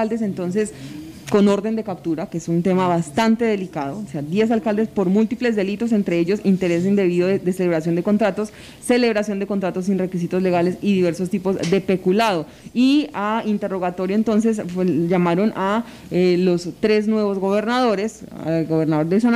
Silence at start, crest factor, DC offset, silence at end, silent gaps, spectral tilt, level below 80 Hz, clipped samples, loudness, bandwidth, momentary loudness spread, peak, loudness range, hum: 0 s; 14 dB; under 0.1%; 0 s; none; -6.5 dB/octave; -54 dBFS; under 0.1%; -20 LUFS; 14.5 kHz; 7 LU; -6 dBFS; 1 LU; none